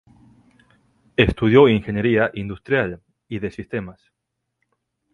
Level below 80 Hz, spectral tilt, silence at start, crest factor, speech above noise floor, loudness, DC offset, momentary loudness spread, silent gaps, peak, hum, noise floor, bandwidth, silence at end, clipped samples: -42 dBFS; -8 dB/octave; 1.2 s; 22 dB; 60 dB; -19 LUFS; under 0.1%; 17 LU; none; 0 dBFS; none; -78 dBFS; 6.6 kHz; 1.2 s; under 0.1%